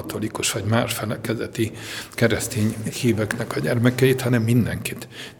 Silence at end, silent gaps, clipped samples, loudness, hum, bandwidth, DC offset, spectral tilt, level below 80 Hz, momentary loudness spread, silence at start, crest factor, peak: 0.05 s; none; under 0.1%; -22 LUFS; none; 19.5 kHz; under 0.1%; -5 dB/octave; -52 dBFS; 10 LU; 0 s; 20 dB; -2 dBFS